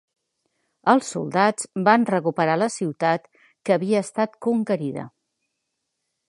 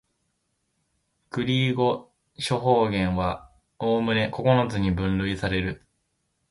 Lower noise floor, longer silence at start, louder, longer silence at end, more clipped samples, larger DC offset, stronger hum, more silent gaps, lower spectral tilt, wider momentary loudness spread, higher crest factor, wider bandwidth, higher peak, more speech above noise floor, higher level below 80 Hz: first, -79 dBFS vs -75 dBFS; second, 0.85 s vs 1.35 s; first, -22 LUFS vs -25 LUFS; first, 1.2 s vs 0.75 s; neither; neither; neither; neither; about the same, -5.5 dB/octave vs -6.5 dB/octave; second, 8 LU vs 11 LU; about the same, 22 dB vs 20 dB; about the same, 11.5 kHz vs 11.5 kHz; first, -2 dBFS vs -6 dBFS; first, 57 dB vs 51 dB; second, -74 dBFS vs -44 dBFS